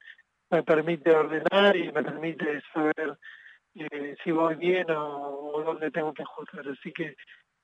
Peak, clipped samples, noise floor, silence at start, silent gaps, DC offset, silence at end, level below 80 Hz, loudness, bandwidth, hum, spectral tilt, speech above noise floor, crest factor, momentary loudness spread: -10 dBFS; under 0.1%; -54 dBFS; 0.05 s; none; under 0.1%; 0.4 s; -78 dBFS; -27 LUFS; 8 kHz; none; -7 dB/octave; 26 dB; 18 dB; 16 LU